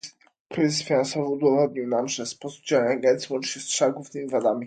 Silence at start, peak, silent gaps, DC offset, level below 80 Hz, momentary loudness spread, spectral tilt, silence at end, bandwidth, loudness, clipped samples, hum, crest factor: 0.05 s; -8 dBFS; 0.40-0.50 s; under 0.1%; -72 dBFS; 12 LU; -4 dB/octave; 0 s; 9.4 kHz; -24 LUFS; under 0.1%; none; 16 dB